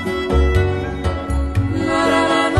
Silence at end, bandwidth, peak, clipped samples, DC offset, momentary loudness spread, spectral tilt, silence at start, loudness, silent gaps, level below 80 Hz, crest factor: 0 s; 12.5 kHz; -2 dBFS; under 0.1%; under 0.1%; 7 LU; -6 dB/octave; 0 s; -18 LUFS; none; -24 dBFS; 14 dB